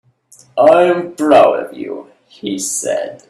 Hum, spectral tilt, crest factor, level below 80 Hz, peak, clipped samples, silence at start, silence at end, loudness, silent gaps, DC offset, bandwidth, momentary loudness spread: none; -3.5 dB/octave; 14 dB; -60 dBFS; 0 dBFS; under 0.1%; 0.55 s; 0.15 s; -13 LUFS; none; under 0.1%; 14 kHz; 17 LU